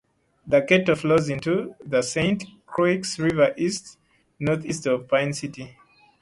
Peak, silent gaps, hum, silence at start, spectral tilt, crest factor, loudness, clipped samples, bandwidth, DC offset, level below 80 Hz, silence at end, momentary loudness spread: -4 dBFS; none; none; 0.45 s; -5 dB/octave; 20 dB; -23 LUFS; under 0.1%; 11.5 kHz; under 0.1%; -56 dBFS; 0.5 s; 12 LU